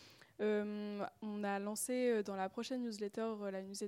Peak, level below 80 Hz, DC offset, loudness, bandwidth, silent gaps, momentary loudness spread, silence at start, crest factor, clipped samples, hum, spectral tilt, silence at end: -26 dBFS; -86 dBFS; under 0.1%; -40 LUFS; 16.5 kHz; none; 8 LU; 0 s; 16 dB; under 0.1%; none; -4.5 dB/octave; 0 s